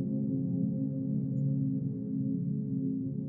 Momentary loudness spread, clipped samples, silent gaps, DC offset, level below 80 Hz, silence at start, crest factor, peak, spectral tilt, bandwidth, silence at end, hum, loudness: 3 LU; under 0.1%; none; under 0.1%; -68 dBFS; 0 s; 10 dB; -20 dBFS; -15.5 dB/octave; 1.1 kHz; 0 s; none; -33 LUFS